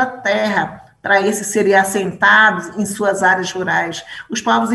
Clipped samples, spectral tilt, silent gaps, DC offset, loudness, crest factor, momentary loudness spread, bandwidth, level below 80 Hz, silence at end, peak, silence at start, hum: under 0.1%; -3.5 dB/octave; none; under 0.1%; -15 LUFS; 14 dB; 13 LU; 13.5 kHz; -58 dBFS; 0 s; -2 dBFS; 0 s; none